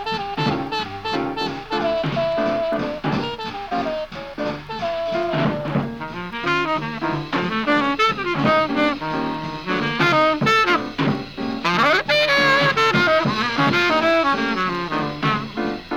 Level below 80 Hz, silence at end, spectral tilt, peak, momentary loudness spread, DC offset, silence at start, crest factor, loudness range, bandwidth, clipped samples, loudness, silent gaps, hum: -46 dBFS; 0 s; -5.5 dB/octave; -4 dBFS; 10 LU; under 0.1%; 0 s; 16 dB; 7 LU; 17 kHz; under 0.1%; -20 LUFS; none; none